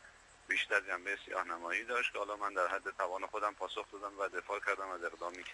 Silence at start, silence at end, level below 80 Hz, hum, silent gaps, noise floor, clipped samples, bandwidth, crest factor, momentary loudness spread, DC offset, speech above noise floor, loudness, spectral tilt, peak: 0 s; 0 s; -72 dBFS; none; none; -59 dBFS; under 0.1%; 11.5 kHz; 22 dB; 8 LU; under 0.1%; 21 dB; -37 LUFS; -1.5 dB/octave; -16 dBFS